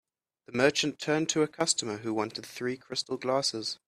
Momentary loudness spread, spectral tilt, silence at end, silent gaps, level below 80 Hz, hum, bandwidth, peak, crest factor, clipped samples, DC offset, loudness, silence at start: 9 LU; -3 dB/octave; 0.1 s; none; -72 dBFS; none; 14 kHz; -8 dBFS; 22 dB; under 0.1%; under 0.1%; -29 LUFS; 0.5 s